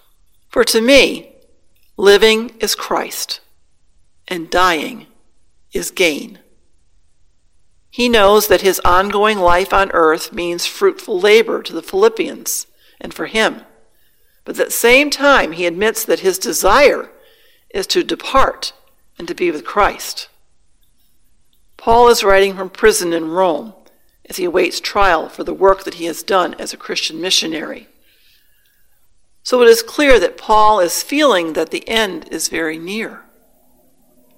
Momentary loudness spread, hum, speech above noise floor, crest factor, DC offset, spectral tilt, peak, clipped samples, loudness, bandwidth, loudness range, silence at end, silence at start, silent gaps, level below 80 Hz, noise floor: 16 LU; none; 44 dB; 16 dB; under 0.1%; -2.5 dB/octave; 0 dBFS; 0.1%; -14 LUFS; 17 kHz; 6 LU; 1.2 s; 0.55 s; none; -38 dBFS; -58 dBFS